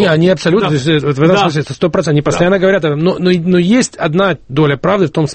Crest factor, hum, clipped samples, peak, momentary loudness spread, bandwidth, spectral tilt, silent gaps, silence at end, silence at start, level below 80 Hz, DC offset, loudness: 12 dB; none; under 0.1%; 0 dBFS; 4 LU; 8.8 kHz; -6 dB/octave; none; 0 s; 0 s; -42 dBFS; under 0.1%; -12 LUFS